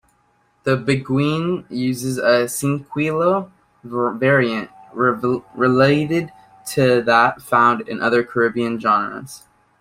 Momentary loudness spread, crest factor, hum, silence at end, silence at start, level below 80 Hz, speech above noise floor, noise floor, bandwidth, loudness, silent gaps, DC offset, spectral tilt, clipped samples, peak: 12 LU; 18 dB; none; 0.45 s; 0.65 s; -58 dBFS; 43 dB; -61 dBFS; 16 kHz; -18 LUFS; none; under 0.1%; -5.5 dB/octave; under 0.1%; -2 dBFS